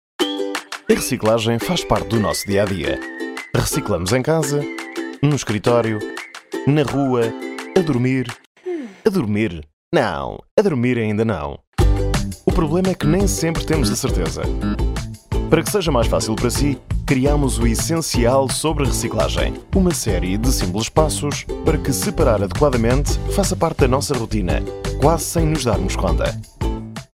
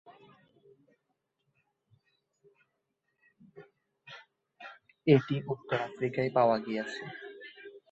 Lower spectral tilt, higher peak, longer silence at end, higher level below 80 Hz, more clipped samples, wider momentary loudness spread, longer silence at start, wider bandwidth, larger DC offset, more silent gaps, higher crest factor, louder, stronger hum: second, -5 dB/octave vs -7.5 dB/octave; first, 0 dBFS vs -10 dBFS; about the same, 0.1 s vs 0.15 s; first, -26 dBFS vs -74 dBFS; neither; second, 9 LU vs 25 LU; about the same, 0.2 s vs 0.1 s; first, 16.5 kHz vs 8.2 kHz; neither; first, 8.46-8.55 s, 9.73-9.91 s, 10.51-10.57 s, 11.67-11.72 s vs none; second, 18 dB vs 26 dB; first, -19 LUFS vs -30 LUFS; neither